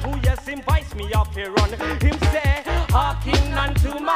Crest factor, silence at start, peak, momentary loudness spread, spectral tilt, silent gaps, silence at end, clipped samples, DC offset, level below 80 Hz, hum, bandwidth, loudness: 18 dB; 0 s; -2 dBFS; 3 LU; -5.5 dB/octave; none; 0 s; under 0.1%; under 0.1%; -24 dBFS; none; 16 kHz; -21 LUFS